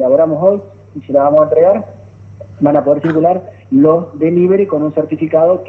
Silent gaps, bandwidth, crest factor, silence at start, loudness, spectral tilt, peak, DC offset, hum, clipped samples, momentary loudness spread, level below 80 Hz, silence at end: none; 4 kHz; 12 dB; 0 s; -12 LUFS; -11 dB/octave; 0 dBFS; under 0.1%; none; under 0.1%; 8 LU; -56 dBFS; 0 s